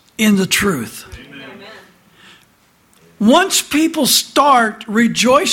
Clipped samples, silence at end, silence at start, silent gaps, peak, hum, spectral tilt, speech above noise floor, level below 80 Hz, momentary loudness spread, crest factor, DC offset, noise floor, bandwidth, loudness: under 0.1%; 0 s; 0.2 s; none; 0 dBFS; none; -3 dB/octave; 40 dB; -50 dBFS; 22 LU; 16 dB; under 0.1%; -54 dBFS; 17 kHz; -13 LUFS